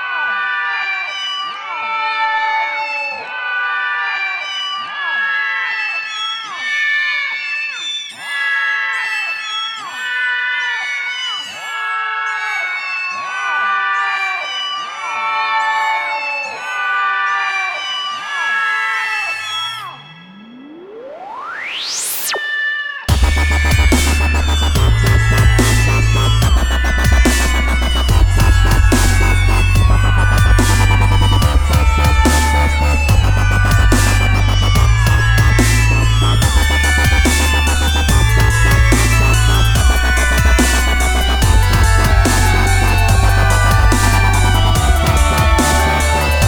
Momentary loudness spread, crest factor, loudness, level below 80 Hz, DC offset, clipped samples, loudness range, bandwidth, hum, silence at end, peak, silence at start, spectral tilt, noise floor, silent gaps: 8 LU; 14 dB; -14 LUFS; -16 dBFS; under 0.1%; under 0.1%; 6 LU; over 20 kHz; none; 0 s; 0 dBFS; 0 s; -4 dB/octave; -37 dBFS; none